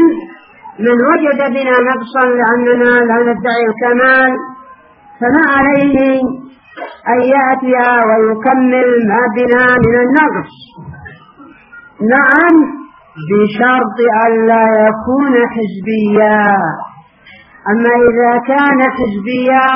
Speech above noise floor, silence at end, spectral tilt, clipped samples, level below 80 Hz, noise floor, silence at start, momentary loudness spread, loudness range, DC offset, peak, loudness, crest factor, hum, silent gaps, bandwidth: 31 dB; 0 s; -4.5 dB/octave; under 0.1%; -46 dBFS; -41 dBFS; 0 s; 10 LU; 3 LU; under 0.1%; 0 dBFS; -10 LUFS; 12 dB; none; none; 5.4 kHz